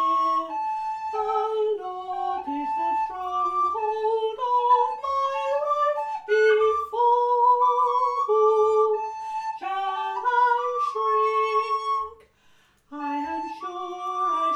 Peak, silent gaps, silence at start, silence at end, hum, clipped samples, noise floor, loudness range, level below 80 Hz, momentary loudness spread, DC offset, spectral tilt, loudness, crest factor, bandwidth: -10 dBFS; none; 0 s; 0 s; 50 Hz at -75 dBFS; under 0.1%; -60 dBFS; 6 LU; -66 dBFS; 11 LU; under 0.1%; -3 dB/octave; -24 LUFS; 14 dB; 8.8 kHz